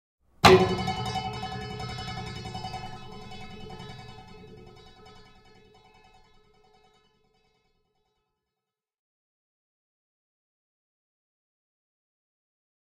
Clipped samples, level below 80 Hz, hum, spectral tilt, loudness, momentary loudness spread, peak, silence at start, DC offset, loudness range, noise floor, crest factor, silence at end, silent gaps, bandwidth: under 0.1%; -52 dBFS; none; -5 dB/octave; -26 LUFS; 29 LU; -2 dBFS; 0.45 s; under 0.1%; 27 LU; -89 dBFS; 30 dB; 7.7 s; none; 15.5 kHz